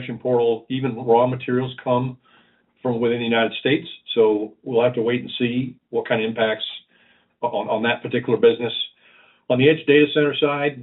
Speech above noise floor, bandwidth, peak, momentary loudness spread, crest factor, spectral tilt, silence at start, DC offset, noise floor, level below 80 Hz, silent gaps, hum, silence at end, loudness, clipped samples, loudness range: 38 dB; 4.1 kHz; -2 dBFS; 10 LU; 18 dB; -4 dB/octave; 0 s; under 0.1%; -58 dBFS; -66 dBFS; none; none; 0 s; -21 LUFS; under 0.1%; 4 LU